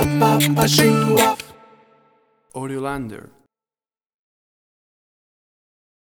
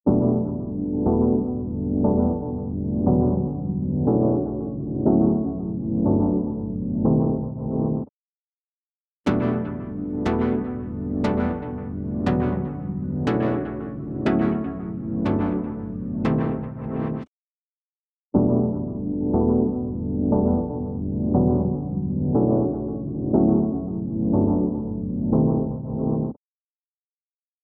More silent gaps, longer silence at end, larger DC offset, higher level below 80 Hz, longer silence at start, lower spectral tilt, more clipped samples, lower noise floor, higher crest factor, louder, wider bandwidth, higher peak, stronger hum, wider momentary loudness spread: second, none vs 8.09-9.24 s, 17.28-18.30 s; first, 3 s vs 1.3 s; neither; second, -48 dBFS vs -40 dBFS; about the same, 0 s vs 0.05 s; second, -4.5 dB/octave vs -10.5 dB/octave; neither; about the same, under -90 dBFS vs under -90 dBFS; first, 22 dB vs 16 dB; first, -17 LUFS vs -24 LUFS; first, over 20 kHz vs 6.4 kHz; first, 0 dBFS vs -6 dBFS; neither; first, 19 LU vs 9 LU